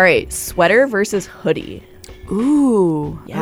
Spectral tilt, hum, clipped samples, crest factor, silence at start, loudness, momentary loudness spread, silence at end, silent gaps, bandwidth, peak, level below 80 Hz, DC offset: -5 dB/octave; none; under 0.1%; 16 dB; 0 s; -16 LUFS; 12 LU; 0 s; none; 19 kHz; -2 dBFS; -42 dBFS; under 0.1%